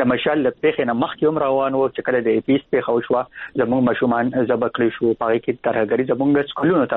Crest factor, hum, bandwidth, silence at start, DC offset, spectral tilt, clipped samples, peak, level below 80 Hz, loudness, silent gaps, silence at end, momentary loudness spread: 14 dB; none; 4.1 kHz; 0 s; under 0.1%; -5 dB/octave; under 0.1%; -6 dBFS; -56 dBFS; -19 LUFS; none; 0 s; 3 LU